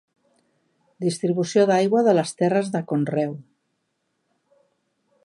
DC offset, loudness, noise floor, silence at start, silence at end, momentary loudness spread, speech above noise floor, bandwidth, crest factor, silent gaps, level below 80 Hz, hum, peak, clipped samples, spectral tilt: under 0.1%; -22 LUFS; -74 dBFS; 1 s; 1.85 s; 9 LU; 53 dB; 11.5 kHz; 18 dB; none; -76 dBFS; none; -6 dBFS; under 0.1%; -6 dB/octave